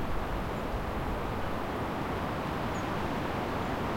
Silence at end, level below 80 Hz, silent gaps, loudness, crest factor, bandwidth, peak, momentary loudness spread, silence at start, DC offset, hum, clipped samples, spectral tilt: 0 s; -42 dBFS; none; -34 LUFS; 12 dB; 16.5 kHz; -20 dBFS; 2 LU; 0 s; 0.2%; none; under 0.1%; -6.5 dB/octave